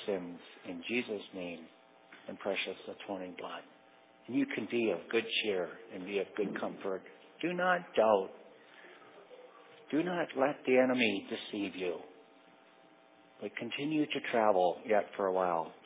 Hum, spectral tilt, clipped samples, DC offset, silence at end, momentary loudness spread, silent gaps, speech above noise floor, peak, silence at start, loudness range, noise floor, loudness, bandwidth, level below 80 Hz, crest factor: none; -3 dB/octave; under 0.1%; under 0.1%; 0.1 s; 17 LU; none; 28 dB; -14 dBFS; 0 s; 6 LU; -62 dBFS; -34 LUFS; 4 kHz; -80 dBFS; 22 dB